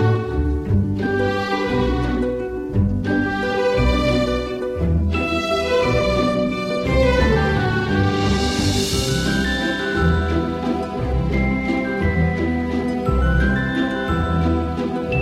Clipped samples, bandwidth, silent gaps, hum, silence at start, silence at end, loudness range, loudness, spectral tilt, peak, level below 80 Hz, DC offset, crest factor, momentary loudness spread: under 0.1%; 15 kHz; none; none; 0 s; 0 s; 2 LU; -20 LUFS; -6 dB/octave; -4 dBFS; -26 dBFS; under 0.1%; 14 dB; 4 LU